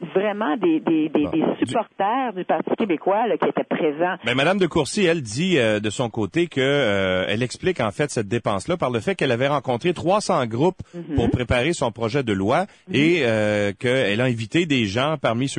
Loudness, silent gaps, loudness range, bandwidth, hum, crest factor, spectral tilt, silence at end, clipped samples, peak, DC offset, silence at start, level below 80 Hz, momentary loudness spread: -21 LUFS; none; 2 LU; 10 kHz; none; 14 dB; -5.5 dB/octave; 0 s; under 0.1%; -8 dBFS; under 0.1%; 0 s; -46 dBFS; 4 LU